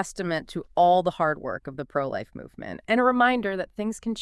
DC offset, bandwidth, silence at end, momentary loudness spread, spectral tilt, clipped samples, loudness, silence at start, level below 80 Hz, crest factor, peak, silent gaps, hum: under 0.1%; 12 kHz; 0 s; 15 LU; -5.5 dB/octave; under 0.1%; -25 LUFS; 0 s; -56 dBFS; 18 dB; -8 dBFS; none; none